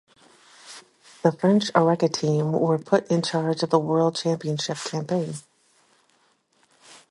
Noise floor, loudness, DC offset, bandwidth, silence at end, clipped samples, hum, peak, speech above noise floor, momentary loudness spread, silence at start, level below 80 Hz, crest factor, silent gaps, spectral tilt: -65 dBFS; -23 LUFS; under 0.1%; 11.5 kHz; 1.7 s; under 0.1%; none; -4 dBFS; 42 dB; 15 LU; 0.65 s; -70 dBFS; 22 dB; none; -6 dB/octave